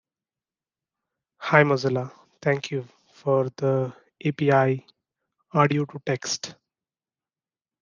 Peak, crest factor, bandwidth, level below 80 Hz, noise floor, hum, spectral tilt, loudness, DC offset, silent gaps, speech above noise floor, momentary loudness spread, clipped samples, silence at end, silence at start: -2 dBFS; 24 dB; 9.6 kHz; -72 dBFS; under -90 dBFS; none; -5.5 dB/octave; -24 LUFS; under 0.1%; none; over 67 dB; 13 LU; under 0.1%; 1.3 s; 1.4 s